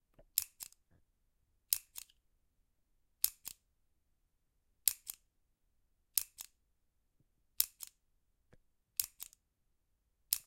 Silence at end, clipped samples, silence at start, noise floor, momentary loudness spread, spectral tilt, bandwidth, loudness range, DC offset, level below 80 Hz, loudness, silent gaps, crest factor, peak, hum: 0.05 s; under 0.1%; 0.35 s; -80 dBFS; 17 LU; 2.5 dB/octave; 17 kHz; 2 LU; under 0.1%; -76 dBFS; -37 LUFS; none; 40 dB; -6 dBFS; none